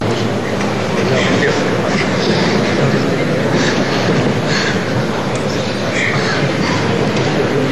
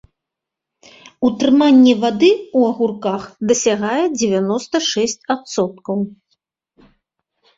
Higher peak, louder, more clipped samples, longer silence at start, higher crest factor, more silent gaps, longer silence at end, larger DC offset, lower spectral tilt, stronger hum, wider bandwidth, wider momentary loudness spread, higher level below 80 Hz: about the same, -2 dBFS vs -2 dBFS; about the same, -15 LUFS vs -16 LUFS; neither; second, 0 s vs 1.2 s; about the same, 12 dB vs 16 dB; neither; second, 0 s vs 1.45 s; first, 3% vs under 0.1%; about the same, -5.5 dB/octave vs -4.5 dB/octave; neither; first, 13 kHz vs 7.8 kHz; second, 4 LU vs 12 LU; first, -46 dBFS vs -60 dBFS